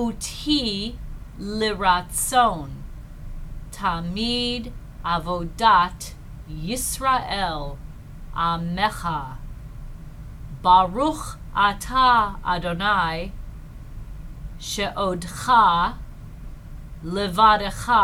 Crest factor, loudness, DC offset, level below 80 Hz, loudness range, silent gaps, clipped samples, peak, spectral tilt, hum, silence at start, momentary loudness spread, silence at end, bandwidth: 20 dB; -22 LUFS; under 0.1%; -36 dBFS; 5 LU; none; under 0.1%; -2 dBFS; -3.5 dB/octave; none; 0 s; 24 LU; 0 s; 18 kHz